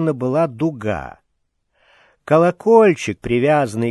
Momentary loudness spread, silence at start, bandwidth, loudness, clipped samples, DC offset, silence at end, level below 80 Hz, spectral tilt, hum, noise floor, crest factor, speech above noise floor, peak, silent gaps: 12 LU; 0 s; 12 kHz; -17 LUFS; under 0.1%; under 0.1%; 0 s; -48 dBFS; -7 dB/octave; none; -69 dBFS; 16 dB; 53 dB; 0 dBFS; none